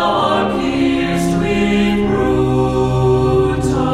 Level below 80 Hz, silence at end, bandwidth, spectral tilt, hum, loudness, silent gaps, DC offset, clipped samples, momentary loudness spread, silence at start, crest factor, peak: -30 dBFS; 0 s; 13.5 kHz; -6.5 dB/octave; none; -15 LUFS; none; under 0.1%; under 0.1%; 2 LU; 0 s; 12 dB; -2 dBFS